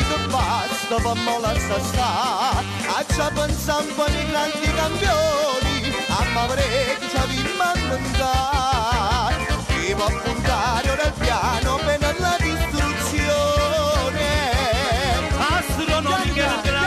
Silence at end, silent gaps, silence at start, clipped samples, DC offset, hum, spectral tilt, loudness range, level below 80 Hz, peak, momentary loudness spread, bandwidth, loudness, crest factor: 0 s; none; 0 s; under 0.1%; under 0.1%; none; -4 dB/octave; 1 LU; -28 dBFS; -10 dBFS; 3 LU; 15.5 kHz; -21 LUFS; 10 dB